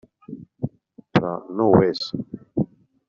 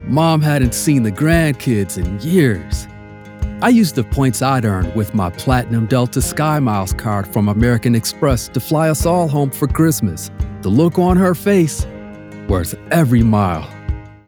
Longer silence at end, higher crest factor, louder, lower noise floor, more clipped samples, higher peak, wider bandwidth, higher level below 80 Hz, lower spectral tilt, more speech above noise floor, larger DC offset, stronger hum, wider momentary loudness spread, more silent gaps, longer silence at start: first, 0.45 s vs 0.15 s; first, 22 dB vs 14 dB; second, -23 LUFS vs -16 LUFS; first, -41 dBFS vs -35 dBFS; neither; about the same, -2 dBFS vs 0 dBFS; second, 7.4 kHz vs over 20 kHz; second, -54 dBFS vs -30 dBFS; about the same, -6 dB/octave vs -6 dB/octave; about the same, 21 dB vs 20 dB; neither; neither; first, 20 LU vs 12 LU; neither; first, 0.3 s vs 0 s